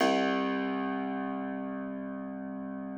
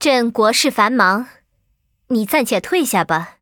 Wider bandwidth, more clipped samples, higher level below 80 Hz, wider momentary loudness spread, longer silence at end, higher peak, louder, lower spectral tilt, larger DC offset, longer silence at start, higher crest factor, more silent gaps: second, 9.2 kHz vs over 20 kHz; neither; second, -68 dBFS vs -60 dBFS; about the same, 10 LU vs 8 LU; second, 0 s vs 0.15 s; second, -14 dBFS vs 0 dBFS; second, -33 LUFS vs -16 LUFS; first, -5.5 dB/octave vs -3 dB/octave; neither; about the same, 0 s vs 0 s; about the same, 18 dB vs 16 dB; neither